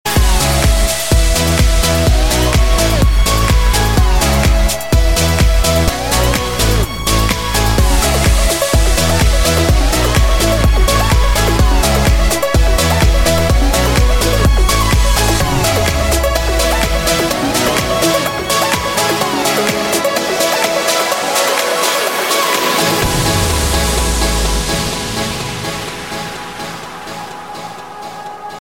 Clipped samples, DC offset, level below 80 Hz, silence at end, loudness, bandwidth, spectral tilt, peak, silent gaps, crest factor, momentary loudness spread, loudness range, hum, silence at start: under 0.1%; 1%; -16 dBFS; 0.05 s; -13 LUFS; 17 kHz; -4 dB/octave; 0 dBFS; none; 12 dB; 8 LU; 3 LU; none; 0.05 s